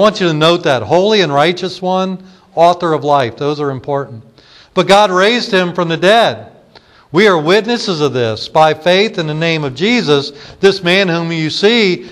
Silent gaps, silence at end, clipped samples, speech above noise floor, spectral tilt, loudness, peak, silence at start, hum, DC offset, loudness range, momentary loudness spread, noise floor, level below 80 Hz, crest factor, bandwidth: none; 0 s; under 0.1%; 32 dB; -5 dB/octave; -12 LUFS; 0 dBFS; 0 s; none; under 0.1%; 2 LU; 9 LU; -44 dBFS; -54 dBFS; 12 dB; 12.5 kHz